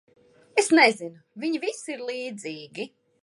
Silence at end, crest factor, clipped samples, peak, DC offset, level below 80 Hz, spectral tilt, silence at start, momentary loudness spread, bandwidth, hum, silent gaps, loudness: 0.35 s; 24 dB; under 0.1%; -4 dBFS; under 0.1%; -82 dBFS; -2.5 dB/octave; 0.55 s; 19 LU; 11.5 kHz; none; none; -24 LUFS